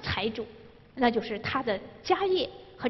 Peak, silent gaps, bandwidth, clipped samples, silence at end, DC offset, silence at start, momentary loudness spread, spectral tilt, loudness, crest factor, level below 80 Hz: -8 dBFS; none; 6 kHz; under 0.1%; 0 s; under 0.1%; 0 s; 12 LU; -6 dB/octave; -29 LUFS; 22 dB; -52 dBFS